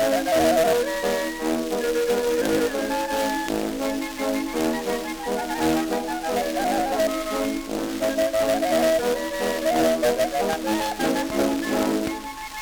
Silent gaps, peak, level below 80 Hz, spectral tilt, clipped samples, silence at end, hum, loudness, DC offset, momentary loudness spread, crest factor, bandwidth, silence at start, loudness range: none; -8 dBFS; -46 dBFS; -3.5 dB/octave; under 0.1%; 0 s; none; -23 LUFS; under 0.1%; 7 LU; 16 dB; over 20 kHz; 0 s; 3 LU